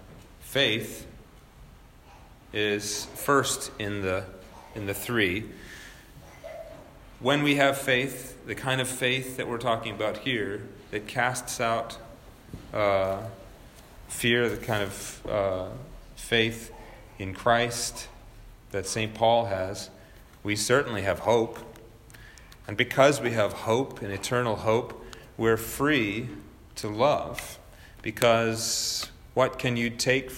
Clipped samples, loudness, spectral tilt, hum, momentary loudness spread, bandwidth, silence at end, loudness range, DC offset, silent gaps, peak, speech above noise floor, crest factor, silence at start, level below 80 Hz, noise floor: under 0.1%; -27 LUFS; -4 dB/octave; none; 20 LU; 16.5 kHz; 0 s; 4 LU; under 0.1%; none; -6 dBFS; 24 dB; 22 dB; 0 s; -52 dBFS; -51 dBFS